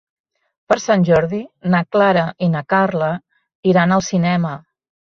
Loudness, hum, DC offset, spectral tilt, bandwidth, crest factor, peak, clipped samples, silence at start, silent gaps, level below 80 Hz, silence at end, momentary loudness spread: -17 LUFS; none; under 0.1%; -6.5 dB/octave; 7.2 kHz; 16 dB; -2 dBFS; under 0.1%; 0.7 s; 3.55-3.63 s; -52 dBFS; 0.45 s; 10 LU